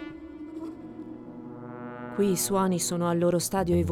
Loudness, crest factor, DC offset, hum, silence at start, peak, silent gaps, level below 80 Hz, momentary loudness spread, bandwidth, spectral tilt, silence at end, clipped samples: -26 LUFS; 16 dB; under 0.1%; none; 0 s; -12 dBFS; none; -52 dBFS; 17 LU; 17.5 kHz; -5 dB/octave; 0 s; under 0.1%